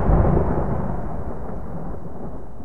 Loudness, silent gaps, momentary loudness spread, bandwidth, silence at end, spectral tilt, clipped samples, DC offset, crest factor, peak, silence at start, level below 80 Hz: -25 LUFS; none; 16 LU; 2.9 kHz; 0 s; -11.5 dB/octave; under 0.1%; 5%; 18 dB; -4 dBFS; 0 s; -26 dBFS